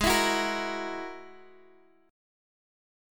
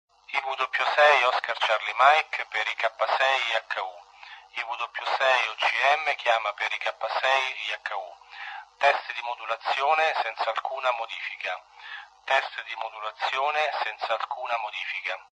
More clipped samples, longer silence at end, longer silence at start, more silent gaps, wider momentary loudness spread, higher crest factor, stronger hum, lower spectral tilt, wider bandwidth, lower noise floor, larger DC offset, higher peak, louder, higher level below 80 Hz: neither; first, 1 s vs 0.15 s; second, 0 s vs 0.3 s; neither; first, 22 LU vs 14 LU; about the same, 22 dB vs 22 dB; neither; first, -2.5 dB/octave vs 1 dB/octave; first, 17.5 kHz vs 10.5 kHz; first, -60 dBFS vs -48 dBFS; neither; second, -12 dBFS vs -6 dBFS; second, -29 LUFS vs -25 LUFS; first, -48 dBFS vs -78 dBFS